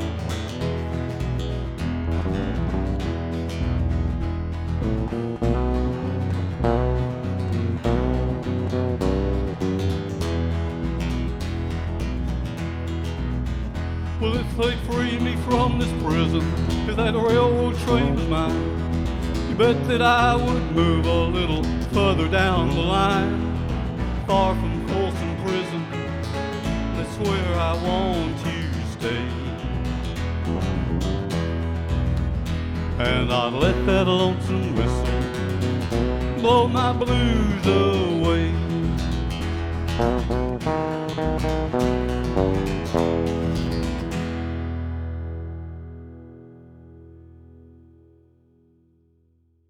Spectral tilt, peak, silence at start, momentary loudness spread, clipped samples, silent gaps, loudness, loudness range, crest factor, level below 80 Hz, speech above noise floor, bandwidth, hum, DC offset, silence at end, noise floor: -7 dB/octave; -4 dBFS; 0 s; 8 LU; under 0.1%; none; -23 LUFS; 6 LU; 18 dB; -30 dBFS; 42 dB; 14 kHz; none; under 0.1%; 2.1 s; -62 dBFS